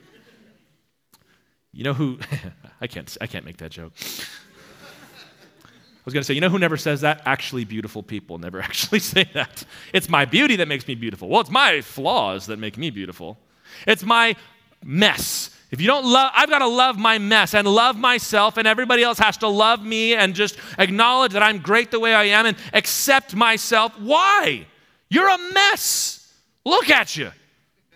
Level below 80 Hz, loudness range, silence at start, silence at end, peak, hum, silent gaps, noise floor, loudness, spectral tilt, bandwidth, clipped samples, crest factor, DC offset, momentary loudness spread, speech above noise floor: -60 dBFS; 15 LU; 1.75 s; 0.65 s; 0 dBFS; none; none; -66 dBFS; -18 LUFS; -3 dB/octave; 16.5 kHz; under 0.1%; 20 dB; under 0.1%; 17 LU; 47 dB